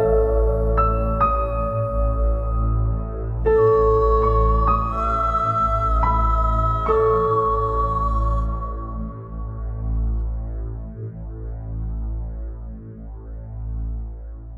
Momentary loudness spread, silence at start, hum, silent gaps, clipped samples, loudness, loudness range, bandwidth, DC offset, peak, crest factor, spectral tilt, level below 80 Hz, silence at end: 16 LU; 0 s; none; none; under 0.1%; -21 LUFS; 13 LU; 4.2 kHz; under 0.1%; -6 dBFS; 14 dB; -9.5 dB/octave; -24 dBFS; 0 s